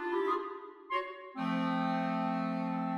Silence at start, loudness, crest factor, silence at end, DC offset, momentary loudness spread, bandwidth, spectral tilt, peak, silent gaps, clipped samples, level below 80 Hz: 0 s; -34 LUFS; 14 dB; 0 s; under 0.1%; 8 LU; 9.4 kHz; -7.5 dB/octave; -20 dBFS; none; under 0.1%; -82 dBFS